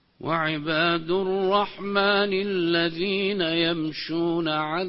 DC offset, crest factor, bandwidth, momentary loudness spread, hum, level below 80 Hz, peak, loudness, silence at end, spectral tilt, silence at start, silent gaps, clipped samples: under 0.1%; 16 dB; 5.8 kHz; 4 LU; none; -60 dBFS; -8 dBFS; -24 LUFS; 0 s; -9.5 dB/octave; 0.2 s; none; under 0.1%